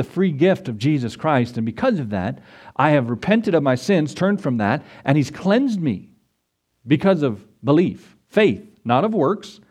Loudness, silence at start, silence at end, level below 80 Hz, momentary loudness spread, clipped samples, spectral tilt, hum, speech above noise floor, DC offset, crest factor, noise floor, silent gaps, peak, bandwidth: -20 LUFS; 0 s; 0.2 s; -58 dBFS; 8 LU; under 0.1%; -7.5 dB/octave; none; 53 dB; under 0.1%; 18 dB; -72 dBFS; none; 0 dBFS; 12 kHz